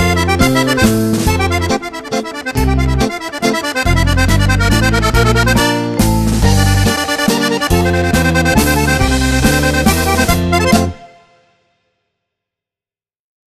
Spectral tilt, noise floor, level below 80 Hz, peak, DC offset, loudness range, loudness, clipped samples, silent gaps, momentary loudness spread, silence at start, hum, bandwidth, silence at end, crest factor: -5 dB/octave; under -90 dBFS; -22 dBFS; 0 dBFS; under 0.1%; 3 LU; -13 LUFS; under 0.1%; none; 5 LU; 0 s; none; 14 kHz; 2.5 s; 14 dB